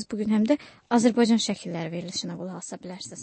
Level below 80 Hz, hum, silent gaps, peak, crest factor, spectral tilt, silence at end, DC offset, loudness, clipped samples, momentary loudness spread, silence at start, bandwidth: -66 dBFS; none; none; -8 dBFS; 18 dB; -5 dB/octave; 0 s; under 0.1%; -25 LUFS; under 0.1%; 16 LU; 0 s; 8.8 kHz